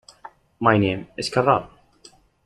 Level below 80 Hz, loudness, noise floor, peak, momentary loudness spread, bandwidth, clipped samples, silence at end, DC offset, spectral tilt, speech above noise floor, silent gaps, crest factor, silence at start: -54 dBFS; -21 LUFS; -53 dBFS; -2 dBFS; 6 LU; 12 kHz; under 0.1%; 0.8 s; under 0.1%; -6 dB/octave; 33 dB; none; 22 dB; 0.6 s